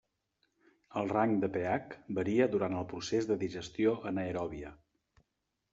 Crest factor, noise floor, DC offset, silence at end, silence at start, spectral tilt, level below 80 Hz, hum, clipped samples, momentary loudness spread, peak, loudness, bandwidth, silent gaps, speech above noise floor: 20 dB; -84 dBFS; under 0.1%; 0.95 s; 0.9 s; -5.5 dB/octave; -66 dBFS; none; under 0.1%; 10 LU; -14 dBFS; -33 LUFS; 7.8 kHz; none; 52 dB